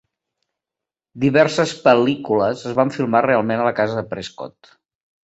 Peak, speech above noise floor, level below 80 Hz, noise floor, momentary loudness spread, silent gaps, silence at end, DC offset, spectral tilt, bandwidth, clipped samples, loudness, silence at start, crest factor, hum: -2 dBFS; 69 dB; -58 dBFS; -87 dBFS; 14 LU; none; 0.85 s; under 0.1%; -6 dB/octave; 8.2 kHz; under 0.1%; -18 LUFS; 1.15 s; 18 dB; none